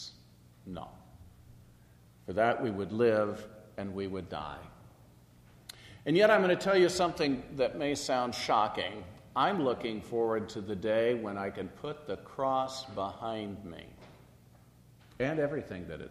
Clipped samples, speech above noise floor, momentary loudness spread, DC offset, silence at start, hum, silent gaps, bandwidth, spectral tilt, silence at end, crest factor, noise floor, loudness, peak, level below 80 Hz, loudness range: under 0.1%; 28 dB; 20 LU; under 0.1%; 0 s; 60 Hz at -60 dBFS; none; 13.5 kHz; -5 dB/octave; 0 s; 22 dB; -59 dBFS; -31 LUFS; -10 dBFS; -62 dBFS; 9 LU